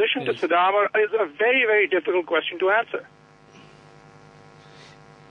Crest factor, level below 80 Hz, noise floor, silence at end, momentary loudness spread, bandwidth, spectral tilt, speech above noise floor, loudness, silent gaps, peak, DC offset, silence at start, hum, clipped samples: 16 dB; -72 dBFS; -50 dBFS; 2.3 s; 6 LU; 6.8 kHz; -5 dB/octave; 28 dB; -21 LUFS; none; -8 dBFS; under 0.1%; 0 s; none; under 0.1%